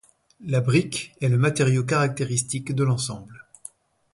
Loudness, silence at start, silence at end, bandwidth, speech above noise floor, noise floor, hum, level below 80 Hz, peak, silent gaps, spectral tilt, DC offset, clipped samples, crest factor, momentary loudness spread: -23 LUFS; 0.4 s; 0.75 s; 11.5 kHz; 24 dB; -47 dBFS; none; -58 dBFS; -8 dBFS; none; -5.5 dB/octave; under 0.1%; under 0.1%; 16 dB; 20 LU